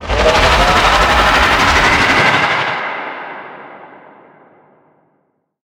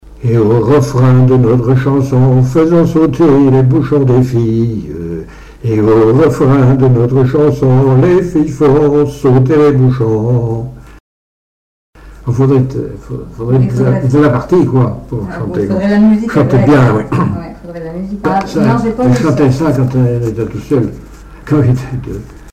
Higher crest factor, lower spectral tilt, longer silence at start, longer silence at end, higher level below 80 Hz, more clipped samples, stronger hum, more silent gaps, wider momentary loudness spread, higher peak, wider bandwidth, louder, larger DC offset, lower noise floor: first, 14 dB vs 8 dB; second, -3.5 dB/octave vs -9 dB/octave; about the same, 0 s vs 0.05 s; first, 1.8 s vs 0 s; first, -26 dBFS vs -34 dBFS; neither; neither; second, none vs 11.00-11.93 s; first, 17 LU vs 13 LU; about the same, 0 dBFS vs -2 dBFS; first, 19 kHz vs 8.6 kHz; about the same, -11 LUFS vs -10 LUFS; neither; second, -63 dBFS vs under -90 dBFS